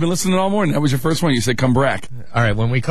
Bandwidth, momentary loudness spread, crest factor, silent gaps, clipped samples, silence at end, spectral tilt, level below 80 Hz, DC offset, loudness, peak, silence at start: 13.5 kHz; 3 LU; 12 dB; none; under 0.1%; 0 s; -5.5 dB/octave; -38 dBFS; 5%; -18 LUFS; -4 dBFS; 0 s